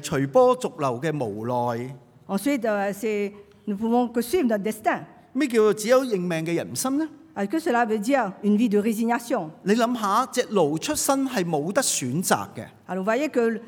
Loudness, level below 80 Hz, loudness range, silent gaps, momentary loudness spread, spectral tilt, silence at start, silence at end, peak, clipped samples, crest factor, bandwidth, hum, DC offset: -24 LUFS; -64 dBFS; 3 LU; none; 8 LU; -4.5 dB/octave; 0 s; 0 s; -4 dBFS; under 0.1%; 20 dB; over 20 kHz; none; under 0.1%